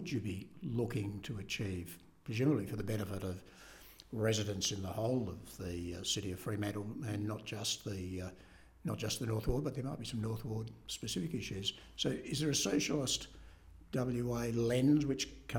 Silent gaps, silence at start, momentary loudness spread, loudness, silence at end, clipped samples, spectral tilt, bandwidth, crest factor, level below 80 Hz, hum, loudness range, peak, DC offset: none; 0 s; 11 LU; -38 LUFS; 0 s; under 0.1%; -4.5 dB/octave; 18 kHz; 18 dB; -56 dBFS; none; 4 LU; -18 dBFS; under 0.1%